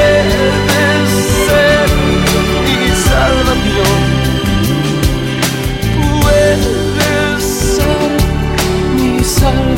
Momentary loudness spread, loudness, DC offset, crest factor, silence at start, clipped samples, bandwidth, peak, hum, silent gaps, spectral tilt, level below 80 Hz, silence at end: 4 LU; -12 LUFS; under 0.1%; 10 dB; 0 s; under 0.1%; 17 kHz; 0 dBFS; none; none; -5 dB/octave; -20 dBFS; 0 s